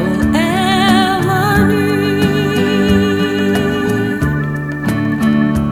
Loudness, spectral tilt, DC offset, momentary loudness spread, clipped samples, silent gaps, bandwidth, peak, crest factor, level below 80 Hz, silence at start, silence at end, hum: -14 LUFS; -6 dB/octave; under 0.1%; 5 LU; under 0.1%; none; 20 kHz; 0 dBFS; 14 dB; -34 dBFS; 0 s; 0 s; none